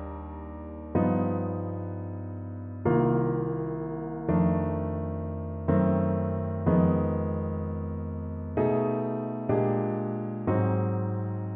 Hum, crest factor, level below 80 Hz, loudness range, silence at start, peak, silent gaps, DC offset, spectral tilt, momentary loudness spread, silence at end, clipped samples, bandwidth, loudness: none; 16 dB; -48 dBFS; 2 LU; 0 s; -12 dBFS; none; under 0.1%; -13.5 dB/octave; 12 LU; 0 s; under 0.1%; 3.5 kHz; -29 LUFS